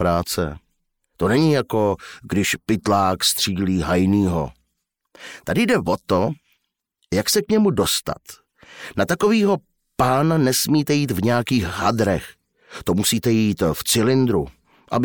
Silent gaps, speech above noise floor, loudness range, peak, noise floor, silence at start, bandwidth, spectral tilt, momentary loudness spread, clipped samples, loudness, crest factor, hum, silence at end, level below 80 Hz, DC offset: none; 56 dB; 3 LU; -6 dBFS; -75 dBFS; 0 s; over 20 kHz; -4.5 dB/octave; 12 LU; under 0.1%; -20 LUFS; 14 dB; none; 0 s; -46 dBFS; under 0.1%